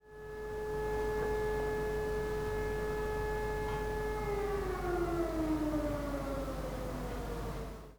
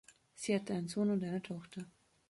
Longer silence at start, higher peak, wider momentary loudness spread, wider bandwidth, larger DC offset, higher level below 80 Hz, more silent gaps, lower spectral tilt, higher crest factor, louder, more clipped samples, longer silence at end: second, 0 s vs 0.35 s; about the same, -24 dBFS vs -22 dBFS; second, 6 LU vs 15 LU; first, over 20 kHz vs 11.5 kHz; first, 0.1% vs under 0.1%; first, -44 dBFS vs -76 dBFS; neither; about the same, -6.5 dB/octave vs -6 dB/octave; second, 12 dB vs 18 dB; about the same, -37 LUFS vs -38 LUFS; neither; second, 0.05 s vs 0.4 s